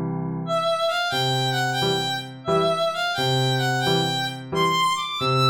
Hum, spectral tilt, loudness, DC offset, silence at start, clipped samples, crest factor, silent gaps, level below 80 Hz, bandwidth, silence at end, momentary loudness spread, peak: none; -4.5 dB/octave; -22 LUFS; 0.1%; 0 s; under 0.1%; 14 dB; none; -56 dBFS; over 20 kHz; 0 s; 5 LU; -8 dBFS